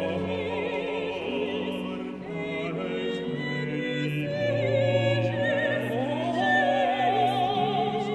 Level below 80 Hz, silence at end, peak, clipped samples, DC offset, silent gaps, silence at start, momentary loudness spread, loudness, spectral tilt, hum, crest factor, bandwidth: -62 dBFS; 0 s; -12 dBFS; under 0.1%; under 0.1%; none; 0 s; 7 LU; -27 LUFS; -6.5 dB/octave; none; 14 dB; 12.5 kHz